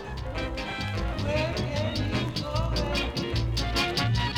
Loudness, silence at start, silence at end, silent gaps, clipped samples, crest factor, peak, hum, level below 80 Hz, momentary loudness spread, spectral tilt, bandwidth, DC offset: -28 LUFS; 0 s; 0 s; none; under 0.1%; 14 dB; -14 dBFS; none; -34 dBFS; 6 LU; -5 dB/octave; 16.5 kHz; under 0.1%